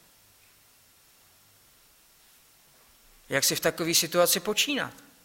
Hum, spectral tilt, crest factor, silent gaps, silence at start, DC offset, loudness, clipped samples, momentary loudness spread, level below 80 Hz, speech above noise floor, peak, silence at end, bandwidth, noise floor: none; -2 dB/octave; 24 dB; none; 3.3 s; under 0.1%; -25 LUFS; under 0.1%; 8 LU; -66 dBFS; 34 dB; -8 dBFS; 0.3 s; 16.5 kHz; -60 dBFS